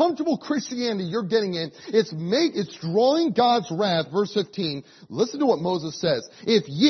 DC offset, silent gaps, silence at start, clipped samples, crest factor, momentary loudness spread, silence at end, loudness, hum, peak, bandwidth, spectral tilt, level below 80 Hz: under 0.1%; none; 0 s; under 0.1%; 16 dB; 8 LU; 0 s; -24 LUFS; none; -6 dBFS; 6.4 kHz; -5.5 dB/octave; -68 dBFS